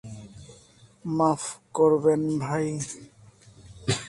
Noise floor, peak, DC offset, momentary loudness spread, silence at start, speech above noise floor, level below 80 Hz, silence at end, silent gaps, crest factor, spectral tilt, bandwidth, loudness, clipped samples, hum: -55 dBFS; -8 dBFS; under 0.1%; 21 LU; 0.05 s; 30 dB; -58 dBFS; 0 s; none; 18 dB; -5.5 dB/octave; 11.5 kHz; -25 LUFS; under 0.1%; none